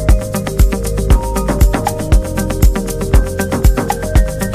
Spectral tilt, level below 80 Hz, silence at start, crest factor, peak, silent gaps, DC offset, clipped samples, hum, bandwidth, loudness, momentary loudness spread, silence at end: -6 dB/octave; -14 dBFS; 0 s; 12 dB; 0 dBFS; none; under 0.1%; under 0.1%; none; 15.5 kHz; -15 LUFS; 4 LU; 0 s